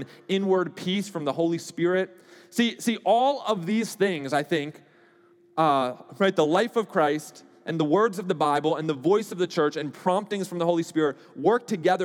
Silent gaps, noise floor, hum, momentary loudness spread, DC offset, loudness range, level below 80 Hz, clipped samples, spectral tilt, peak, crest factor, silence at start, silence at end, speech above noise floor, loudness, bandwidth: none; -58 dBFS; none; 7 LU; under 0.1%; 2 LU; under -90 dBFS; under 0.1%; -5.5 dB/octave; -8 dBFS; 18 dB; 0 s; 0 s; 33 dB; -25 LUFS; 17.5 kHz